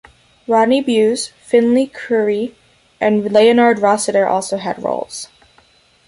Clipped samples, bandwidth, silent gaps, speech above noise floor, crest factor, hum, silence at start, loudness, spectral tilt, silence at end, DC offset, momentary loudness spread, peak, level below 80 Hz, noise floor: under 0.1%; 11.5 kHz; none; 38 dB; 14 dB; none; 0.5 s; -15 LUFS; -4.5 dB/octave; 0.8 s; under 0.1%; 12 LU; -2 dBFS; -58 dBFS; -52 dBFS